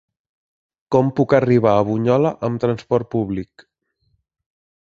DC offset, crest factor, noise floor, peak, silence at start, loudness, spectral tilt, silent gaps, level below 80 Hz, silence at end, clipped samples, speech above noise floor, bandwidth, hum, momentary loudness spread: under 0.1%; 18 dB; -67 dBFS; -2 dBFS; 0.9 s; -18 LUFS; -8.5 dB/octave; none; -52 dBFS; 1.4 s; under 0.1%; 50 dB; 7.4 kHz; none; 9 LU